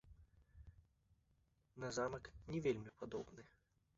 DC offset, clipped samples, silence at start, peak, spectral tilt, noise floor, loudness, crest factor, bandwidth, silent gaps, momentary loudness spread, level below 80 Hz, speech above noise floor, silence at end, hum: under 0.1%; under 0.1%; 0.05 s; -28 dBFS; -5.5 dB/octave; -79 dBFS; -46 LUFS; 22 dB; 7.6 kHz; none; 23 LU; -68 dBFS; 34 dB; 0.5 s; none